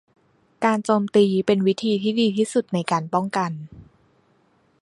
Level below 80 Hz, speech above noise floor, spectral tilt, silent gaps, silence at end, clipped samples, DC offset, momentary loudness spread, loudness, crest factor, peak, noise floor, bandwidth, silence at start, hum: -62 dBFS; 41 dB; -6 dB/octave; none; 1 s; under 0.1%; under 0.1%; 7 LU; -21 LUFS; 18 dB; -4 dBFS; -62 dBFS; 11.5 kHz; 0.6 s; none